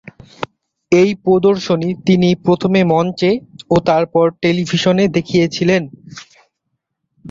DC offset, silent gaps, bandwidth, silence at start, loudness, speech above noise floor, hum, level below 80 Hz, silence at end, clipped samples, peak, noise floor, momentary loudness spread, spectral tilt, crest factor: under 0.1%; none; 7.6 kHz; 0.4 s; -14 LUFS; 59 dB; none; -50 dBFS; 0 s; under 0.1%; -2 dBFS; -73 dBFS; 16 LU; -6.5 dB/octave; 14 dB